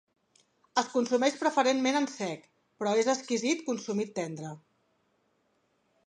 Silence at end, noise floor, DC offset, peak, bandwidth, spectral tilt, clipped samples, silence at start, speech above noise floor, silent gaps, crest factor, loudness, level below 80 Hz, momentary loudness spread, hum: 1.5 s; -73 dBFS; under 0.1%; -12 dBFS; 11 kHz; -3.5 dB/octave; under 0.1%; 0.75 s; 44 dB; none; 20 dB; -29 LUFS; -82 dBFS; 12 LU; none